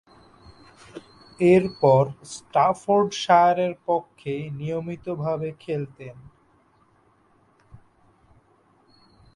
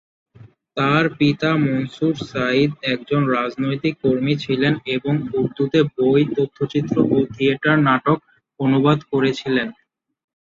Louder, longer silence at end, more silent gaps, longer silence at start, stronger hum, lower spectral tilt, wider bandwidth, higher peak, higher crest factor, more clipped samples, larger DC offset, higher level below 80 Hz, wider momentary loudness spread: second, -22 LUFS vs -19 LUFS; first, 1.6 s vs 0.7 s; neither; first, 0.95 s vs 0.4 s; neither; about the same, -6.5 dB/octave vs -7.5 dB/octave; first, 11.5 kHz vs 7.4 kHz; about the same, -4 dBFS vs -2 dBFS; about the same, 20 dB vs 16 dB; neither; neither; about the same, -60 dBFS vs -56 dBFS; first, 23 LU vs 6 LU